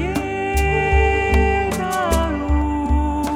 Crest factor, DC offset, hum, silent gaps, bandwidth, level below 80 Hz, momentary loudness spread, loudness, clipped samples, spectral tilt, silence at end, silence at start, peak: 14 dB; under 0.1%; none; none; 16 kHz; -22 dBFS; 5 LU; -19 LUFS; under 0.1%; -6 dB/octave; 0 s; 0 s; -4 dBFS